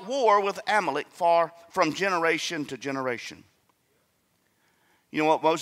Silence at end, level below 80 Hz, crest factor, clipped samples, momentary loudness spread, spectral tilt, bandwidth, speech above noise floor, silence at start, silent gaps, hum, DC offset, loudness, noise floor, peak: 0 s; -76 dBFS; 20 dB; under 0.1%; 10 LU; -3.5 dB/octave; 15.5 kHz; 45 dB; 0 s; none; none; under 0.1%; -26 LUFS; -70 dBFS; -8 dBFS